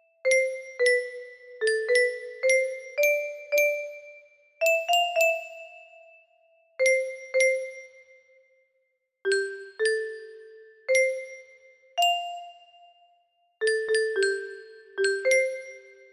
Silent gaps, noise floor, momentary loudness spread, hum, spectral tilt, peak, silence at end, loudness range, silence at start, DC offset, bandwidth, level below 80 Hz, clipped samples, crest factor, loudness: none; -74 dBFS; 19 LU; none; 0.5 dB/octave; -10 dBFS; 0.3 s; 4 LU; 0.25 s; under 0.1%; 15.5 kHz; -78 dBFS; under 0.1%; 18 dB; -25 LUFS